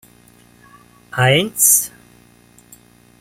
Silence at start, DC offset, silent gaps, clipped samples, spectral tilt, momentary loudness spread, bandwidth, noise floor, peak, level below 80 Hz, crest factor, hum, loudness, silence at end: 1.15 s; under 0.1%; none; under 0.1%; -2.5 dB/octave; 17 LU; 16.5 kHz; -49 dBFS; 0 dBFS; -56 dBFS; 20 dB; 60 Hz at -50 dBFS; -13 LUFS; 1.3 s